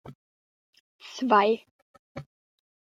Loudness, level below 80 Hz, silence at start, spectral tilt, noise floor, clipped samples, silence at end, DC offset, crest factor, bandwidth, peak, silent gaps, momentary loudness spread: -24 LUFS; -72 dBFS; 0.05 s; -5 dB/octave; under -90 dBFS; under 0.1%; 0.65 s; under 0.1%; 22 dB; 7.6 kHz; -8 dBFS; 0.15-0.73 s, 0.80-0.99 s, 1.71-2.15 s; 24 LU